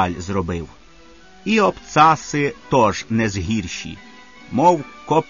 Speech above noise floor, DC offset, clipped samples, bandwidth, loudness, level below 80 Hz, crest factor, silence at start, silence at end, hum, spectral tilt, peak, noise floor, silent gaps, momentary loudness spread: 28 dB; 0.4%; under 0.1%; 7.4 kHz; -19 LUFS; -44 dBFS; 18 dB; 0 s; 0.05 s; none; -5.5 dB/octave; -2 dBFS; -47 dBFS; none; 15 LU